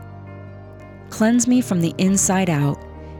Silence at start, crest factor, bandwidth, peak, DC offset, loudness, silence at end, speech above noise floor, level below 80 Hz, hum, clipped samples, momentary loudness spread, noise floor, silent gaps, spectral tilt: 0 s; 14 dB; 18 kHz; -6 dBFS; under 0.1%; -18 LUFS; 0 s; 21 dB; -48 dBFS; 50 Hz at -55 dBFS; under 0.1%; 23 LU; -39 dBFS; none; -5 dB/octave